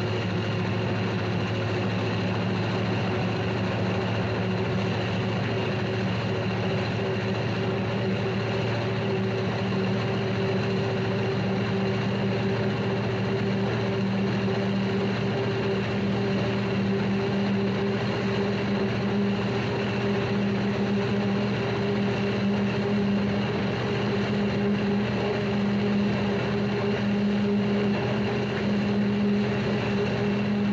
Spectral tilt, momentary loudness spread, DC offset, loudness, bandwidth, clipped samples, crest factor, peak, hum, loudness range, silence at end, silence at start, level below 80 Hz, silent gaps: -7.5 dB/octave; 2 LU; under 0.1%; -26 LUFS; 7.6 kHz; under 0.1%; 12 dB; -14 dBFS; none; 2 LU; 0 s; 0 s; -52 dBFS; none